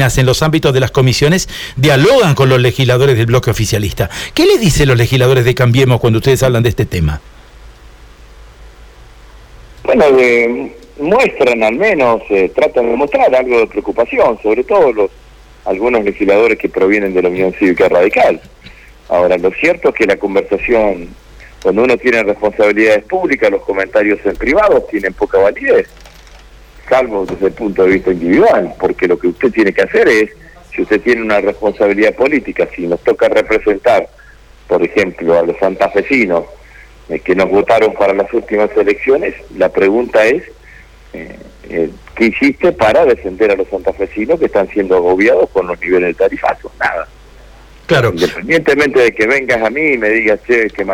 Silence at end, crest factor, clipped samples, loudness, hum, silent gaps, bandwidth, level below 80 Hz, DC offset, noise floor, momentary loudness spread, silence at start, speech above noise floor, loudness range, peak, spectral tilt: 0 s; 10 dB; under 0.1%; -12 LUFS; none; none; 18.5 kHz; -34 dBFS; under 0.1%; -39 dBFS; 8 LU; 0 s; 28 dB; 4 LU; -2 dBFS; -6 dB/octave